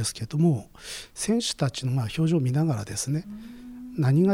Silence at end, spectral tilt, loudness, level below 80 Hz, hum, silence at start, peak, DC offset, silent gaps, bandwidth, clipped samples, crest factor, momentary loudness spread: 0 s; -6 dB/octave; -26 LUFS; -54 dBFS; none; 0 s; -12 dBFS; under 0.1%; none; 16 kHz; under 0.1%; 14 dB; 15 LU